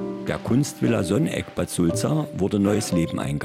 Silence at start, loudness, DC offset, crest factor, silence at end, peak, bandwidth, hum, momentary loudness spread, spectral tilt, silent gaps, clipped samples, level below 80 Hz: 0 s; -23 LUFS; under 0.1%; 14 dB; 0 s; -10 dBFS; 16.5 kHz; none; 6 LU; -6 dB/octave; none; under 0.1%; -50 dBFS